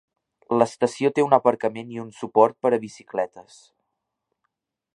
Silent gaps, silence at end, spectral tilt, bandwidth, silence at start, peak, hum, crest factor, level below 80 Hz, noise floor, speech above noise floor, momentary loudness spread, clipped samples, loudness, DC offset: none; 1.55 s; -6 dB/octave; 11.5 kHz; 0.5 s; -2 dBFS; none; 22 dB; -72 dBFS; -80 dBFS; 58 dB; 13 LU; under 0.1%; -22 LUFS; under 0.1%